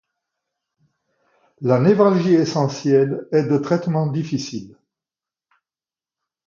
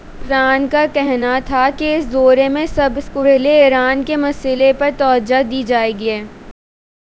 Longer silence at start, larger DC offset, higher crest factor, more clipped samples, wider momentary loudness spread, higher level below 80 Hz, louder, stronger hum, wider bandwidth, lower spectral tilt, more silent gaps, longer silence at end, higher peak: first, 1.6 s vs 0.05 s; neither; first, 20 dB vs 14 dB; neither; first, 11 LU vs 7 LU; second, -66 dBFS vs -38 dBFS; second, -18 LUFS vs -14 LUFS; neither; about the same, 7.4 kHz vs 8 kHz; first, -7.5 dB/octave vs -5.5 dB/octave; neither; first, 1.8 s vs 0.6 s; about the same, -2 dBFS vs 0 dBFS